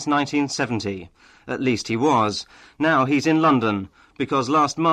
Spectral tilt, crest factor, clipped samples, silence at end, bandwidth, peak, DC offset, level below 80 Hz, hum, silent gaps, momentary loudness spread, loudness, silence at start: -5 dB/octave; 12 dB; under 0.1%; 0 s; 10.5 kHz; -8 dBFS; under 0.1%; -58 dBFS; none; none; 13 LU; -21 LUFS; 0 s